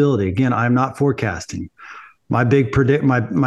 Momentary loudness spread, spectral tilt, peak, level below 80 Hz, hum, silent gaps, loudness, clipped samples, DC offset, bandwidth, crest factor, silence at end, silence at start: 15 LU; -7.5 dB/octave; -2 dBFS; -46 dBFS; none; none; -18 LUFS; under 0.1%; under 0.1%; 10 kHz; 16 dB; 0 s; 0 s